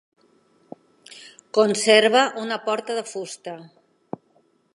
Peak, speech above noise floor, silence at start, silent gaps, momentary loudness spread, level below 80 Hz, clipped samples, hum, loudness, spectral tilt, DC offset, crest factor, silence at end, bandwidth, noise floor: -2 dBFS; 42 dB; 1.1 s; none; 25 LU; -80 dBFS; under 0.1%; none; -20 LUFS; -2.5 dB/octave; under 0.1%; 22 dB; 1.1 s; 11.5 kHz; -63 dBFS